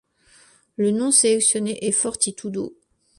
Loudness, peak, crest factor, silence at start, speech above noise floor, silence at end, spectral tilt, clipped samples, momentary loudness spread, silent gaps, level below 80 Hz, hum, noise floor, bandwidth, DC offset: -20 LUFS; -2 dBFS; 20 dB; 0.8 s; 34 dB; 0.45 s; -3 dB/octave; under 0.1%; 15 LU; none; -64 dBFS; none; -55 dBFS; 11.5 kHz; under 0.1%